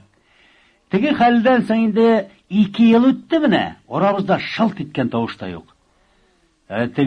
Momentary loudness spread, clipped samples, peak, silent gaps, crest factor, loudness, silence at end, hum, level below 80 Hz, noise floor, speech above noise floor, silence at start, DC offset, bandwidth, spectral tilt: 11 LU; under 0.1%; -2 dBFS; none; 16 dB; -17 LUFS; 0 s; none; -56 dBFS; -59 dBFS; 42 dB; 0.9 s; under 0.1%; 6.4 kHz; -8 dB/octave